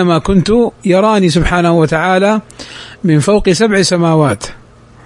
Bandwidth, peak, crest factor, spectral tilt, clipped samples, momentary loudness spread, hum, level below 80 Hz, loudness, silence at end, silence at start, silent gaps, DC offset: 11 kHz; 0 dBFS; 12 dB; -5.5 dB/octave; under 0.1%; 10 LU; none; -30 dBFS; -11 LUFS; 0.5 s; 0 s; none; under 0.1%